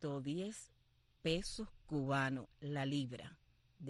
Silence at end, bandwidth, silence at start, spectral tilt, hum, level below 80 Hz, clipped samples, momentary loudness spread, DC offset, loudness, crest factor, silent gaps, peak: 0 s; 12 kHz; 0 s; -5.5 dB/octave; none; -62 dBFS; under 0.1%; 15 LU; under 0.1%; -41 LUFS; 18 dB; none; -24 dBFS